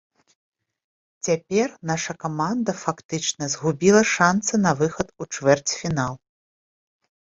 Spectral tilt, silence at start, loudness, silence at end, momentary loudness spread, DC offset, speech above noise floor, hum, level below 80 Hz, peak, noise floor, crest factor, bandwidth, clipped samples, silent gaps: -4.5 dB/octave; 1.25 s; -22 LUFS; 1.15 s; 11 LU; under 0.1%; over 68 dB; none; -58 dBFS; -2 dBFS; under -90 dBFS; 22 dB; 8 kHz; under 0.1%; 3.05-3.09 s